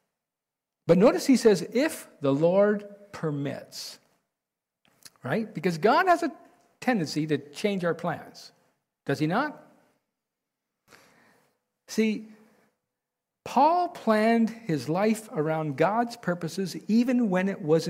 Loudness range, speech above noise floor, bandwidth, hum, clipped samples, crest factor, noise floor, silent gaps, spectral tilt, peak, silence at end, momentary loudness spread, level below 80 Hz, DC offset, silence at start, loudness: 10 LU; 63 dB; 16 kHz; none; under 0.1%; 18 dB; -88 dBFS; none; -6 dB/octave; -10 dBFS; 0 s; 13 LU; -70 dBFS; under 0.1%; 0.85 s; -26 LUFS